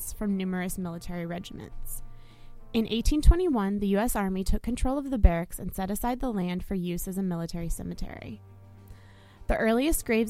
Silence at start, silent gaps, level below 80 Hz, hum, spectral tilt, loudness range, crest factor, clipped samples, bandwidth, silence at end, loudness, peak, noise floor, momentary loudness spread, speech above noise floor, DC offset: 0 s; none; -32 dBFS; none; -6 dB/octave; 6 LU; 24 dB; under 0.1%; 16 kHz; 0 s; -29 LUFS; -4 dBFS; -50 dBFS; 16 LU; 24 dB; under 0.1%